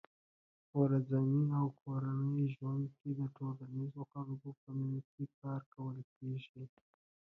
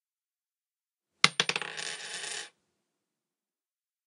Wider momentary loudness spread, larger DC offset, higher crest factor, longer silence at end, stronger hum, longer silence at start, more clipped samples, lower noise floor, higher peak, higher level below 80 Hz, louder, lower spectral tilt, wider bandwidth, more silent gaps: about the same, 13 LU vs 14 LU; neither; second, 18 dB vs 36 dB; second, 0.7 s vs 1.6 s; neither; second, 0.75 s vs 1.25 s; neither; about the same, under -90 dBFS vs under -90 dBFS; second, -20 dBFS vs 0 dBFS; first, -80 dBFS vs -88 dBFS; second, -39 LUFS vs -29 LUFS; first, -10.5 dB/octave vs -0.5 dB/octave; second, 4 kHz vs 15.5 kHz; first, 1.82-1.86 s, 4.57-4.67 s, 5.05-5.18 s, 5.34-5.42 s, 5.66-5.72 s, 6.04-6.21 s, 6.49-6.54 s vs none